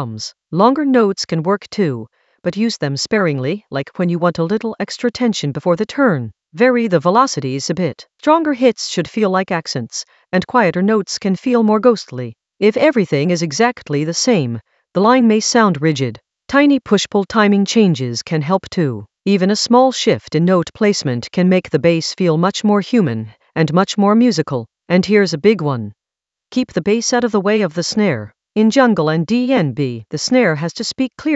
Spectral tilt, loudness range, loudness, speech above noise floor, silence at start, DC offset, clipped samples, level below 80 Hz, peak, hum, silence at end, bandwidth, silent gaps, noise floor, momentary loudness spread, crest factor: -5.5 dB/octave; 3 LU; -16 LUFS; 71 dB; 0 s; under 0.1%; under 0.1%; -56 dBFS; 0 dBFS; none; 0 s; 8.2 kHz; none; -86 dBFS; 10 LU; 16 dB